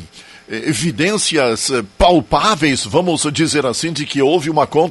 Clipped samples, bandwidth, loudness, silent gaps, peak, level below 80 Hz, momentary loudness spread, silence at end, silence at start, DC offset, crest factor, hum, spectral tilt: under 0.1%; 12 kHz; -15 LUFS; none; 0 dBFS; -36 dBFS; 6 LU; 0 s; 0 s; under 0.1%; 16 dB; none; -4 dB/octave